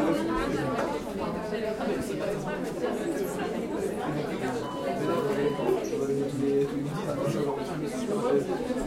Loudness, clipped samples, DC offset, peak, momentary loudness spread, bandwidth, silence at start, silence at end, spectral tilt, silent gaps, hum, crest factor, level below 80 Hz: -30 LUFS; under 0.1%; under 0.1%; -14 dBFS; 5 LU; 16.5 kHz; 0 s; 0 s; -6 dB/octave; none; none; 16 dB; -52 dBFS